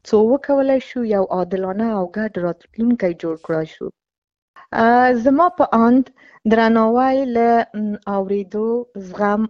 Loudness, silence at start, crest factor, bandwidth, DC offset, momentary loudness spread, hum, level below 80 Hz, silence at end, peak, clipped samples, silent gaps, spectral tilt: -18 LUFS; 0.05 s; 16 dB; 7.2 kHz; under 0.1%; 11 LU; none; -54 dBFS; 0 s; -2 dBFS; under 0.1%; 4.18-4.22 s, 4.42-4.54 s; -7.5 dB/octave